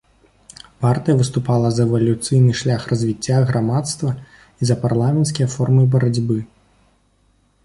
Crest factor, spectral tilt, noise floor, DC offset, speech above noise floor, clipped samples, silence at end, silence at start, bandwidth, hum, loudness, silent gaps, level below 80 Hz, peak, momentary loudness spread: 14 dB; -6.5 dB/octave; -59 dBFS; under 0.1%; 43 dB; under 0.1%; 1.2 s; 0.8 s; 11.5 kHz; none; -18 LUFS; none; -48 dBFS; -4 dBFS; 7 LU